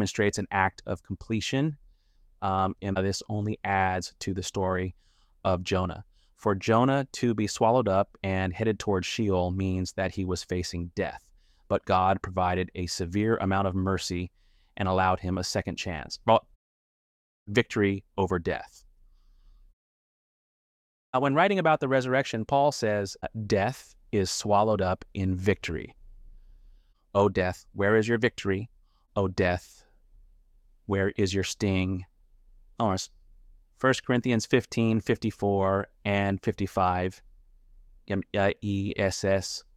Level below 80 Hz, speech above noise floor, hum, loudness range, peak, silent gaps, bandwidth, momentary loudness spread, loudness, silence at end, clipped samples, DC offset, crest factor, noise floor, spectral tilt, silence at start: -54 dBFS; 34 dB; none; 4 LU; -6 dBFS; 16.56-17.46 s, 19.73-21.13 s; 14 kHz; 9 LU; -28 LUFS; 0.15 s; under 0.1%; under 0.1%; 22 dB; -61 dBFS; -5.5 dB/octave; 0 s